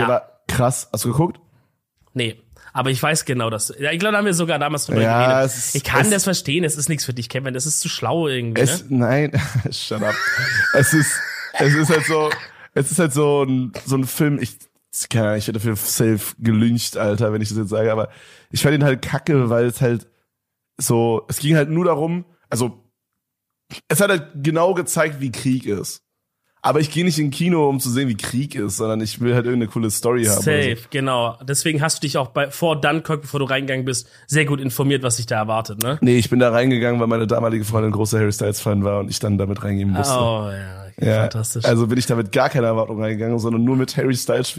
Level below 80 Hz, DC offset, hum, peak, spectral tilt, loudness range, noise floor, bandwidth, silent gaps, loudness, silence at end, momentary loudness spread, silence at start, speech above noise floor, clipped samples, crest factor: -52 dBFS; under 0.1%; none; 0 dBFS; -5 dB/octave; 3 LU; -79 dBFS; 15.5 kHz; none; -19 LUFS; 0 s; 8 LU; 0 s; 60 dB; under 0.1%; 18 dB